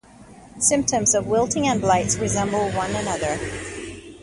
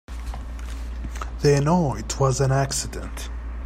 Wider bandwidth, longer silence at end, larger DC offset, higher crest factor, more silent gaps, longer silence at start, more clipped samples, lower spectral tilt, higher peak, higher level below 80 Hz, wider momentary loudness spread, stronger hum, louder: second, 11.5 kHz vs 15 kHz; about the same, 0 s vs 0 s; neither; about the same, 18 dB vs 18 dB; neither; about the same, 0.2 s vs 0.1 s; neither; second, -3.5 dB/octave vs -5.5 dB/octave; about the same, -4 dBFS vs -6 dBFS; second, -44 dBFS vs -32 dBFS; second, 12 LU vs 15 LU; neither; first, -21 LUFS vs -24 LUFS